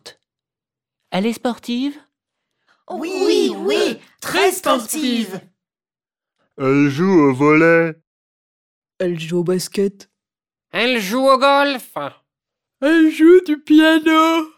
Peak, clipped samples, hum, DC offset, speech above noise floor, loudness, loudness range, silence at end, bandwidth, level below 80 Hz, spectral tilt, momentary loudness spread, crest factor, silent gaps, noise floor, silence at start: -2 dBFS; under 0.1%; none; under 0.1%; over 74 dB; -16 LUFS; 7 LU; 0.1 s; 18 kHz; -64 dBFS; -5 dB/octave; 14 LU; 16 dB; 8.07-8.82 s; under -90 dBFS; 0.05 s